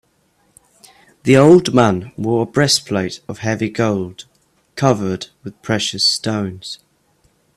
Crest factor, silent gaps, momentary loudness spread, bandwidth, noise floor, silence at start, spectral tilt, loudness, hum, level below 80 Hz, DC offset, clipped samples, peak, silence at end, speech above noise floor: 18 dB; none; 20 LU; 14 kHz; -60 dBFS; 1.25 s; -5 dB/octave; -16 LUFS; none; -52 dBFS; under 0.1%; under 0.1%; 0 dBFS; 0.8 s; 44 dB